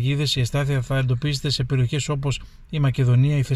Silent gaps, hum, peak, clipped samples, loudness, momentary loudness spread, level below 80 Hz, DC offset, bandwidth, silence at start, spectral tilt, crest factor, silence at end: none; none; -10 dBFS; under 0.1%; -22 LUFS; 7 LU; -40 dBFS; under 0.1%; 12.5 kHz; 0 s; -6 dB/octave; 12 dB; 0 s